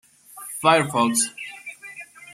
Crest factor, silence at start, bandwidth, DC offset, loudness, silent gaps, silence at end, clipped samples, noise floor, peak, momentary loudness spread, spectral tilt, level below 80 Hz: 22 dB; 0.35 s; 16 kHz; under 0.1%; -20 LUFS; none; 0 s; under 0.1%; -42 dBFS; -2 dBFS; 20 LU; -3 dB/octave; -72 dBFS